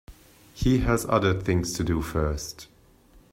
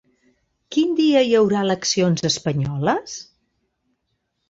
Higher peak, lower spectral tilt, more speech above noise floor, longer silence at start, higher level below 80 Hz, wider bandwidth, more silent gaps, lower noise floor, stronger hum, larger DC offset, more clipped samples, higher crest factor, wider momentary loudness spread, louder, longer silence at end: about the same, -6 dBFS vs -6 dBFS; about the same, -6 dB/octave vs -5 dB/octave; second, 31 dB vs 55 dB; second, 0.1 s vs 0.7 s; first, -38 dBFS vs -56 dBFS; first, 16 kHz vs 8 kHz; neither; second, -56 dBFS vs -73 dBFS; neither; neither; neither; about the same, 20 dB vs 16 dB; about the same, 10 LU vs 9 LU; second, -25 LUFS vs -19 LUFS; second, 0.65 s vs 1.25 s